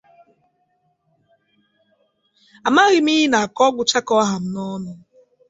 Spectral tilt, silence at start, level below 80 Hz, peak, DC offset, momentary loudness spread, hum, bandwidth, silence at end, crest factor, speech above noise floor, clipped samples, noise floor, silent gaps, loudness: -3.5 dB/octave; 2.65 s; -64 dBFS; -2 dBFS; under 0.1%; 14 LU; none; 8 kHz; 0.55 s; 18 dB; 49 dB; under 0.1%; -66 dBFS; none; -17 LUFS